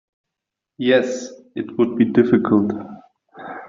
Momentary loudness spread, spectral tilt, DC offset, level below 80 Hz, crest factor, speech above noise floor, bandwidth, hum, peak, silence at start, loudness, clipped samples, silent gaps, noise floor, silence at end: 18 LU; -5.5 dB/octave; under 0.1%; -60 dBFS; 18 dB; 66 dB; 7.6 kHz; none; -4 dBFS; 0.8 s; -18 LUFS; under 0.1%; none; -84 dBFS; 0 s